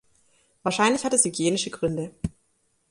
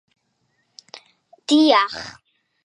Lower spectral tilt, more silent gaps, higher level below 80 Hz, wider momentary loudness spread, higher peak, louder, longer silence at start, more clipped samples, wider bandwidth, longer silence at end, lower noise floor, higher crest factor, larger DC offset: about the same, -3.5 dB/octave vs -2.5 dB/octave; neither; first, -52 dBFS vs -66 dBFS; second, 13 LU vs 27 LU; second, -6 dBFS vs -2 dBFS; second, -24 LUFS vs -17 LUFS; second, 0.65 s vs 1.5 s; neither; about the same, 11.5 kHz vs 11 kHz; about the same, 0.6 s vs 0.55 s; about the same, -69 dBFS vs -69 dBFS; about the same, 20 dB vs 20 dB; neither